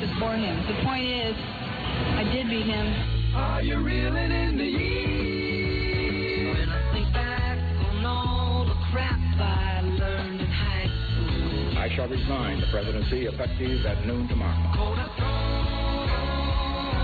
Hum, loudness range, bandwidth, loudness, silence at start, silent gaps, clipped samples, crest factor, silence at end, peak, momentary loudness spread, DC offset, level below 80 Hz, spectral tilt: none; 1 LU; 4.8 kHz; -27 LUFS; 0 s; none; under 0.1%; 12 dB; 0 s; -14 dBFS; 2 LU; under 0.1%; -30 dBFS; -8.5 dB/octave